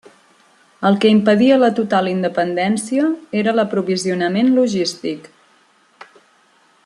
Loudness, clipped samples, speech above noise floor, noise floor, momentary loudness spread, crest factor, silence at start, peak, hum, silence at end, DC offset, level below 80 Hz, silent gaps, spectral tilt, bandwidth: -16 LUFS; under 0.1%; 39 dB; -55 dBFS; 8 LU; 16 dB; 0.8 s; -2 dBFS; none; 1.65 s; under 0.1%; -64 dBFS; none; -5.5 dB/octave; 11.5 kHz